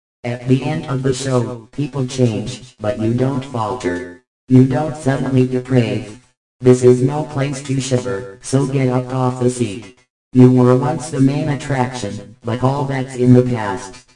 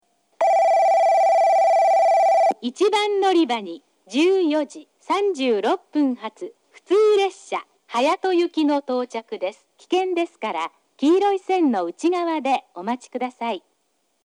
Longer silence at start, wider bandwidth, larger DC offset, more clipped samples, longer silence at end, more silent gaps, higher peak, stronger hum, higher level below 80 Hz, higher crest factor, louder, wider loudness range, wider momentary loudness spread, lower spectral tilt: second, 0.25 s vs 0.4 s; second, 10.5 kHz vs 12.5 kHz; neither; neither; second, 0.15 s vs 0.65 s; first, 4.27-4.47 s, 6.37-6.60 s, 10.10-10.31 s vs none; first, 0 dBFS vs -8 dBFS; neither; first, -48 dBFS vs -86 dBFS; about the same, 16 dB vs 12 dB; first, -17 LUFS vs -20 LUFS; about the same, 4 LU vs 6 LU; about the same, 13 LU vs 13 LU; first, -7 dB/octave vs -3.5 dB/octave